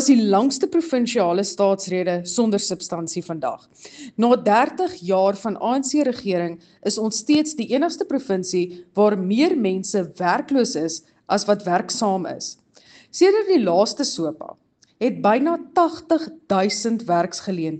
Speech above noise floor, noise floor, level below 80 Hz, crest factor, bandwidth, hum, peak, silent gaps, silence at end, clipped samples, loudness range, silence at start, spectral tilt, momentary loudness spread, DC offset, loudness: 31 dB; -51 dBFS; -68 dBFS; 18 dB; 9.2 kHz; none; -4 dBFS; none; 0 s; under 0.1%; 2 LU; 0 s; -4.5 dB/octave; 10 LU; under 0.1%; -21 LUFS